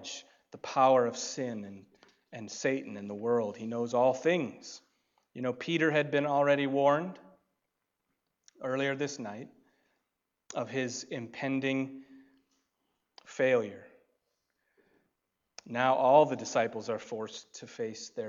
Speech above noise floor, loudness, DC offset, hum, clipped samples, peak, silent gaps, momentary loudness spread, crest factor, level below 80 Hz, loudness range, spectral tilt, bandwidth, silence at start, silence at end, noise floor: 54 dB; -30 LUFS; under 0.1%; none; under 0.1%; -10 dBFS; none; 20 LU; 22 dB; -84 dBFS; 7 LU; -4.5 dB/octave; 7.8 kHz; 0 s; 0 s; -84 dBFS